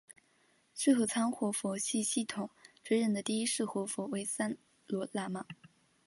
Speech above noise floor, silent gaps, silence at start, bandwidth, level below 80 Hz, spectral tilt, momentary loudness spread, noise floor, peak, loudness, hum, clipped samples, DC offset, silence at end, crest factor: 37 dB; none; 0.75 s; 12 kHz; -80 dBFS; -3.5 dB/octave; 15 LU; -71 dBFS; -16 dBFS; -34 LUFS; none; under 0.1%; under 0.1%; 0.55 s; 20 dB